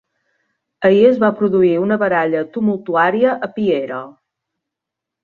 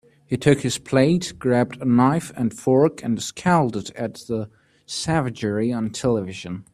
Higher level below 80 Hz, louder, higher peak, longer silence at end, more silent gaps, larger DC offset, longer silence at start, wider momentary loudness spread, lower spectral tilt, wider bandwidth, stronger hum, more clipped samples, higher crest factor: second, -60 dBFS vs -54 dBFS; first, -15 LUFS vs -22 LUFS; about the same, -2 dBFS vs 0 dBFS; first, 1.15 s vs 0.1 s; neither; neither; first, 0.8 s vs 0.3 s; second, 8 LU vs 11 LU; first, -8.5 dB/octave vs -6 dB/octave; second, 6.6 kHz vs 13.5 kHz; neither; neither; about the same, 16 dB vs 20 dB